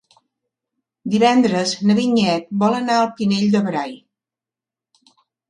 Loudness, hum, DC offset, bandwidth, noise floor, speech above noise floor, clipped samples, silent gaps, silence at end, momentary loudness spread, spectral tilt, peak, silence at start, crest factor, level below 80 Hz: -18 LUFS; none; under 0.1%; 10 kHz; -89 dBFS; 72 dB; under 0.1%; none; 1.55 s; 8 LU; -5.5 dB/octave; 0 dBFS; 1.05 s; 18 dB; -64 dBFS